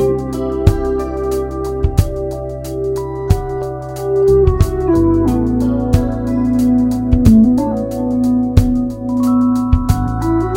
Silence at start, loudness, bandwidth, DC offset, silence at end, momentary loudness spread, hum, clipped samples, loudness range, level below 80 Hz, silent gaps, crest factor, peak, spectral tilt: 0 s; -15 LUFS; 16.5 kHz; under 0.1%; 0 s; 9 LU; none; 0.2%; 5 LU; -22 dBFS; none; 14 dB; 0 dBFS; -8.5 dB/octave